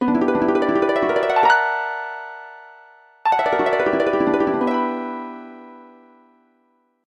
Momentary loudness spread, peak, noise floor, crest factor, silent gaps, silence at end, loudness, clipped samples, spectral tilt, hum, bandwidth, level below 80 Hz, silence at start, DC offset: 19 LU; -4 dBFS; -64 dBFS; 18 dB; none; 1.25 s; -19 LUFS; under 0.1%; -6 dB/octave; none; 9.6 kHz; -58 dBFS; 0 s; under 0.1%